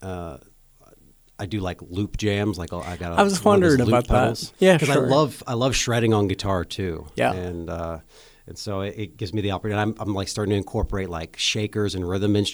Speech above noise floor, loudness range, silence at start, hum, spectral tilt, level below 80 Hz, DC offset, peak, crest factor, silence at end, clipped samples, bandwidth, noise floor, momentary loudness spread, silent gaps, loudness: 31 dB; 9 LU; 0 s; none; -5.5 dB/octave; -40 dBFS; under 0.1%; -2 dBFS; 20 dB; 0 s; under 0.1%; over 20 kHz; -54 dBFS; 14 LU; none; -23 LUFS